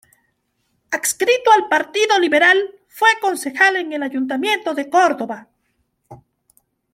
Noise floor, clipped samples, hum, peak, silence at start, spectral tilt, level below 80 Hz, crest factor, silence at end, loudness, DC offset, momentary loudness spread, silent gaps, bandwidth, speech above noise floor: -68 dBFS; under 0.1%; none; -2 dBFS; 0.9 s; -1 dB/octave; -68 dBFS; 18 dB; 0.75 s; -16 LUFS; under 0.1%; 11 LU; none; 16.5 kHz; 52 dB